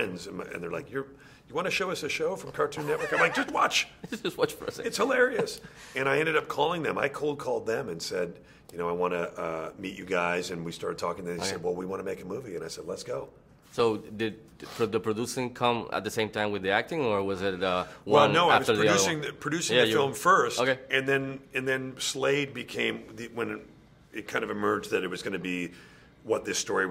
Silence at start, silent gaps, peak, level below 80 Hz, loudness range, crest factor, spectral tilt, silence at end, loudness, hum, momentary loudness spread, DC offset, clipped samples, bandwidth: 0 s; none; -6 dBFS; -62 dBFS; 8 LU; 24 dB; -3.5 dB/octave; 0 s; -28 LUFS; none; 14 LU; under 0.1%; under 0.1%; 16 kHz